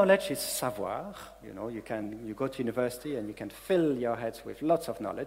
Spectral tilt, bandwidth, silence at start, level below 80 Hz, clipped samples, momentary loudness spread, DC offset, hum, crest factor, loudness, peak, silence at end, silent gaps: -4.5 dB/octave; 16 kHz; 0 s; -60 dBFS; under 0.1%; 13 LU; under 0.1%; none; 22 dB; -32 LUFS; -10 dBFS; 0 s; none